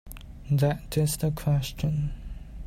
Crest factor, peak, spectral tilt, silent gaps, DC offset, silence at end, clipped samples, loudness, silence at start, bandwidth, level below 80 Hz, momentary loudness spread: 14 dB; -14 dBFS; -6 dB/octave; none; under 0.1%; 0 s; under 0.1%; -27 LUFS; 0.05 s; 16 kHz; -40 dBFS; 18 LU